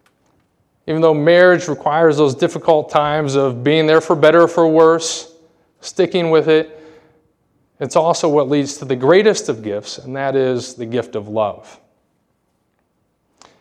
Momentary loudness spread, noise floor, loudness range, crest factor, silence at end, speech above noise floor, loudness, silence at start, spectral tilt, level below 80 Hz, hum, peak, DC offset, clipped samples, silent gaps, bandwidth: 13 LU; -65 dBFS; 9 LU; 16 dB; 2.05 s; 51 dB; -15 LUFS; 0.85 s; -5 dB/octave; -62 dBFS; none; 0 dBFS; under 0.1%; under 0.1%; none; 10.5 kHz